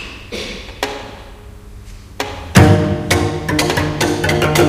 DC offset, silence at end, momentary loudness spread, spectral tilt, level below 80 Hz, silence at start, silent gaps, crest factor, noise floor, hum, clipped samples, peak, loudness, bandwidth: under 0.1%; 0 s; 17 LU; -5 dB/octave; -32 dBFS; 0 s; none; 16 dB; -35 dBFS; none; 0.1%; 0 dBFS; -16 LUFS; 16 kHz